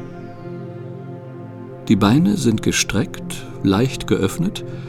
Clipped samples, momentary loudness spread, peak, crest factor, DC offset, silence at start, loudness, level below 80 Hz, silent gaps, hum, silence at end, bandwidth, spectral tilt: under 0.1%; 19 LU; 0 dBFS; 20 dB; under 0.1%; 0 s; -19 LUFS; -42 dBFS; none; none; 0 s; 16 kHz; -5 dB/octave